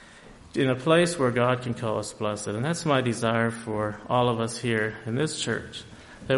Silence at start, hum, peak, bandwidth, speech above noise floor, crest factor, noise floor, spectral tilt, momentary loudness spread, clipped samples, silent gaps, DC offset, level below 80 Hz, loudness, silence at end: 0 s; none; -8 dBFS; 11.5 kHz; 23 dB; 18 dB; -49 dBFS; -5 dB/octave; 9 LU; under 0.1%; none; under 0.1%; -56 dBFS; -26 LUFS; 0 s